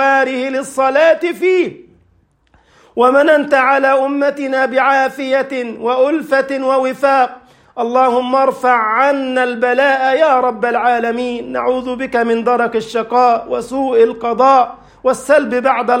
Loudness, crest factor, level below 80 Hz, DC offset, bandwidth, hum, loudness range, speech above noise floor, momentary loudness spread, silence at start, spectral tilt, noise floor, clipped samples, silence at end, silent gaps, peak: -14 LUFS; 14 dB; -56 dBFS; under 0.1%; 15.5 kHz; none; 2 LU; 42 dB; 8 LU; 0 s; -4 dB/octave; -56 dBFS; under 0.1%; 0 s; none; 0 dBFS